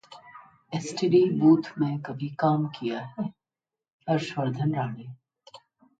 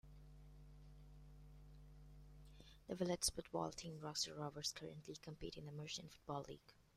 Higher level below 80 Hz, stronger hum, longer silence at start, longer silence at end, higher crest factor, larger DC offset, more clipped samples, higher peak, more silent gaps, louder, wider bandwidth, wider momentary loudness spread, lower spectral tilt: second, -70 dBFS vs -64 dBFS; second, none vs 50 Hz at -70 dBFS; about the same, 0.1 s vs 0.05 s; first, 0.45 s vs 0.1 s; second, 18 dB vs 24 dB; neither; neither; first, -8 dBFS vs -26 dBFS; first, 3.93-3.99 s vs none; first, -26 LUFS vs -47 LUFS; second, 9 kHz vs 15.5 kHz; second, 18 LU vs 22 LU; first, -7 dB/octave vs -3.5 dB/octave